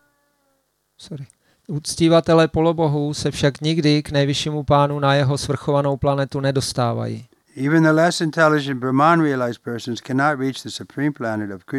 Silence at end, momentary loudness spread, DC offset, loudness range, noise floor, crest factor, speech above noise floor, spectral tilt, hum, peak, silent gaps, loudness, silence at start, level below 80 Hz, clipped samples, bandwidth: 0 s; 12 LU; under 0.1%; 2 LU; -68 dBFS; 18 dB; 49 dB; -6 dB/octave; none; -2 dBFS; none; -19 LUFS; 1 s; -48 dBFS; under 0.1%; 13.5 kHz